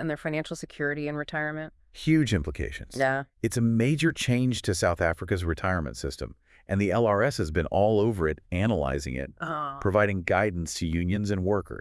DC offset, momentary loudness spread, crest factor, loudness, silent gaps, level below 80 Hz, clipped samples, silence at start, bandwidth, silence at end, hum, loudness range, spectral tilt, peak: under 0.1%; 10 LU; 18 dB; -27 LUFS; none; -46 dBFS; under 0.1%; 0 s; 12 kHz; 0 s; none; 1 LU; -6 dB/octave; -8 dBFS